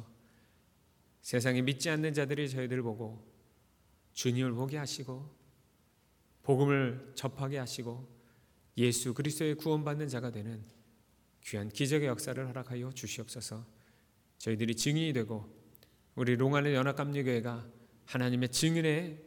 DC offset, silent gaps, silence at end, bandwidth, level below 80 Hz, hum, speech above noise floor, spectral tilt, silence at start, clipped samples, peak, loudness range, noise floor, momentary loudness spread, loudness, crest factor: under 0.1%; none; 0.05 s; 19 kHz; -70 dBFS; none; 36 dB; -5 dB/octave; 0 s; under 0.1%; -14 dBFS; 5 LU; -69 dBFS; 15 LU; -34 LUFS; 20 dB